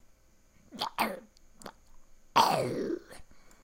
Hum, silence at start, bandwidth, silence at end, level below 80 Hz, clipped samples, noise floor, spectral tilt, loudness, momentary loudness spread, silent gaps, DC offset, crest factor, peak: none; 0.7 s; 16.5 kHz; 0.25 s; -60 dBFS; under 0.1%; -62 dBFS; -3.5 dB/octave; -31 LUFS; 24 LU; none; under 0.1%; 26 dB; -8 dBFS